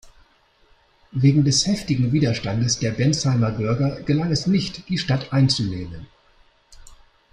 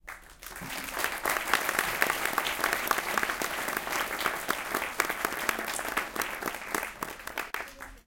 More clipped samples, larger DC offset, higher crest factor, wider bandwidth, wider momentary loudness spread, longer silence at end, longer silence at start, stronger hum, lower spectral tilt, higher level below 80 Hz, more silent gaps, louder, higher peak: neither; neither; second, 18 dB vs 28 dB; second, 11 kHz vs 17 kHz; about the same, 8 LU vs 10 LU; first, 0.4 s vs 0.05 s; about the same, 0.05 s vs 0.05 s; neither; first, -5.5 dB/octave vs -1 dB/octave; first, -48 dBFS vs -56 dBFS; neither; first, -21 LUFS vs -30 LUFS; about the same, -4 dBFS vs -4 dBFS